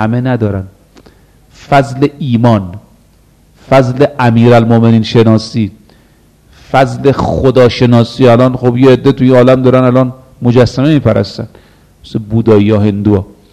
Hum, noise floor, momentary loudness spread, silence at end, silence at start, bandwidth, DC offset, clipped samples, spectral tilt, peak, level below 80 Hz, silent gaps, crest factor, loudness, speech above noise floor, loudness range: none; -45 dBFS; 10 LU; 0.3 s; 0 s; 9.6 kHz; under 0.1%; 2%; -8 dB/octave; 0 dBFS; -36 dBFS; none; 10 dB; -9 LUFS; 37 dB; 5 LU